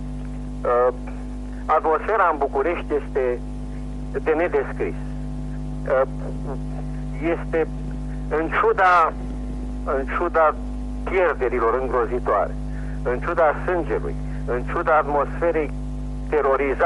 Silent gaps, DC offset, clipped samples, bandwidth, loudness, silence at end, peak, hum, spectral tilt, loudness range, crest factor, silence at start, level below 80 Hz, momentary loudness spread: none; under 0.1%; under 0.1%; 11 kHz; -23 LUFS; 0 s; -6 dBFS; 50 Hz at -30 dBFS; -7.5 dB/octave; 5 LU; 16 dB; 0 s; -32 dBFS; 12 LU